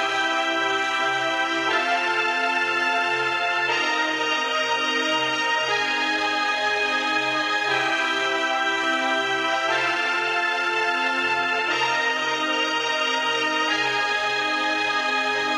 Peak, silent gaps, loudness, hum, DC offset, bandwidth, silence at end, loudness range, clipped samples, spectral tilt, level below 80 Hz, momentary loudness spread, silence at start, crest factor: -8 dBFS; none; -21 LUFS; none; under 0.1%; 15 kHz; 0 s; 0 LU; under 0.1%; -1.5 dB/octave; -66 dBFS; 1 LU; 0 s; 14 dB